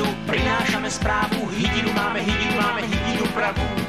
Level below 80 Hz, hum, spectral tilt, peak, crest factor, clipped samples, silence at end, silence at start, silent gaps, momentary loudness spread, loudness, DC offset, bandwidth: -34 dBFS; none; -4.5 dB/octave; -8 dBFS; 14 dB; under 0.1%; 0 s; 0 s; none; 3 LU; -22 LUFS; 0.4%; 15.5 kHz